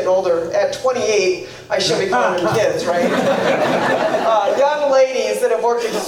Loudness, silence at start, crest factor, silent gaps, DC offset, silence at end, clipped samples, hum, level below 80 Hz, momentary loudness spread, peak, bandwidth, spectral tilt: -17 LUFS; 0 s; 12 dB; none; under 0.1%; 0 s; under 0.1%; none; -56 dBFS; 4 LU; -4 dBFS; 16 kHz; -4 dB/octave